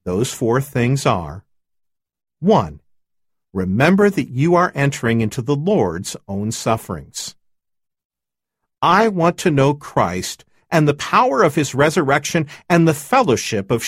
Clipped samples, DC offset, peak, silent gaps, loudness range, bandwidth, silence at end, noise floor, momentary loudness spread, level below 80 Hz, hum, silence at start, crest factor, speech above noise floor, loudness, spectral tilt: under 0.1%; under 0.1%; 0 dBFS; 8.05-8.10 s; 5 LU; 16 kHz; 0 s; -86 dBFS; 12 LU; -48 dBFS; none; 0.05 s; 18 dB; 69 dB; -17 LUFS; -5.5 dB/octave